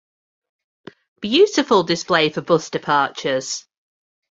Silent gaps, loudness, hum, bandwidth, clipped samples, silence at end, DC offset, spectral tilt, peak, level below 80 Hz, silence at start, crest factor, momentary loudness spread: none; -18 LUFS; none; 8 kHz; under 0.1%; 0.7 s; under 0.1%; -4 dB/octave; -2 dBFS; -62 dBFS; 1.2 s; 20 dB; 10 LU